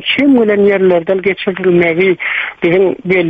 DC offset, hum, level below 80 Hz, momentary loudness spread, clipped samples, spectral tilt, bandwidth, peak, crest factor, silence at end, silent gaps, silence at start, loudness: under 0.1%; none; -50 dBFS; 5 LU; under 0.1%; -8.5 dB/octave; 4.8 kHz; 0 dBFS; 10 dB; 0 s; none; 0 s; -11 LUFS